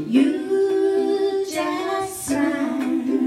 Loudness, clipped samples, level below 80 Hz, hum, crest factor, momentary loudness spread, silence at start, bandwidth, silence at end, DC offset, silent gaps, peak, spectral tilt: -22 LUFS; under 0.1%; -60 dBFS; none; 14 dB; 5 LU; 0 s; 14.5 kHz; 0 s; under 0.1%; none; -6 dBFS; -4.5 dB/octave